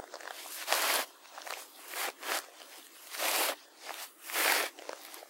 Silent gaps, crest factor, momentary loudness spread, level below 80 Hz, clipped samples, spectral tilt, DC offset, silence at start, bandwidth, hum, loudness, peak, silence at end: none; 26 dB; 17 LU; under -90 dBFS; under 0.1%; 3.5 dB/octave; under 0.1%; 0 s; 16 kHz; none; -33 LUFS; -10 dBFS; 0 s